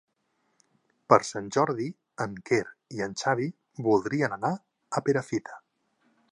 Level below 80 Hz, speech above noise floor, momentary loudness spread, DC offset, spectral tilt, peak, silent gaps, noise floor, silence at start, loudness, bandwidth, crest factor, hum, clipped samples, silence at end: -68 dBFS; 47 dB; 12 LU; under 0.1%; -5.5 dB/octave; -4 dBFS; none; -74 dBFS; 1.1 s; -28 LUFS; 11 kHz; 26 dB; none; under 0.1%; 0.75 s